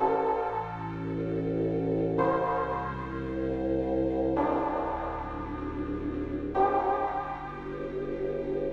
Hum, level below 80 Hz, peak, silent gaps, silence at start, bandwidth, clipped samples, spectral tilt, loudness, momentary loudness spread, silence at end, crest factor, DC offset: none; -46 dBFS; -14 dBFS; none; 0 s; 6.8 kHz; under 0.1%; -9 dB/octave; -30 LUFS; 9 LU; 0 s; 16 dB; under 0.1%